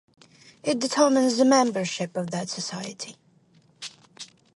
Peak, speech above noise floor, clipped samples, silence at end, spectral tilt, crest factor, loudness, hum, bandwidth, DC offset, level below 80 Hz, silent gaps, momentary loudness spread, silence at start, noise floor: -6 dBFS; 36 dB; under 0.1%; 0.3 s; -4 dB/octave; 20 dB; -24 LUFS; none; 11.5 kHz; under 0.1%; -76 dBFS; none; 21 LU; 0.65 s; -60 dBFS